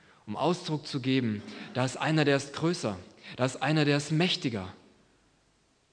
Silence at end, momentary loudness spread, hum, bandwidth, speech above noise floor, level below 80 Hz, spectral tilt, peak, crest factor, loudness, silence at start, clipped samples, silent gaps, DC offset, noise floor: 1.15 s; 12 LU; none; 10 kHz; 39 dB; -72 dBFS; -5.5 dB/octave; -10 dBFS; 20 dB; -29 LUFS; 0.25 s; under 0.1%; none; under 0.1%; -68 dBFS